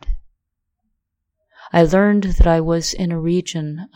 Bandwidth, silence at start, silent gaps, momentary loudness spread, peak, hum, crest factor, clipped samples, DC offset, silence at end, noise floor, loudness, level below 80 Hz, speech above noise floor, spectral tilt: 15.5 kHz; 0.05 s; none; 12 LU; 0 dBFS; none; 18 dB; under 0.1%; under 0.1%; 0.1 s; -76 dBFS; -17 LUFS; -24 dBFS; 60 dB; -6 dB/octave